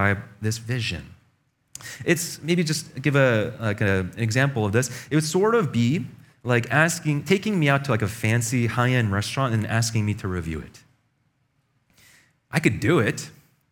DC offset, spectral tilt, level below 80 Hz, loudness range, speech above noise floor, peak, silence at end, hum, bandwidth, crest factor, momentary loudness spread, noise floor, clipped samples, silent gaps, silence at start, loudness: under 0.1%; -5.5 dB/octave; -52 dBFS; 5 LU; 46 dB; -2 dBFS; 0.4 s; none; 17.5 kHz; 22 dB; 10 LU; -69 dBFS; under 0.1%; none; 0 s; -23 LUFS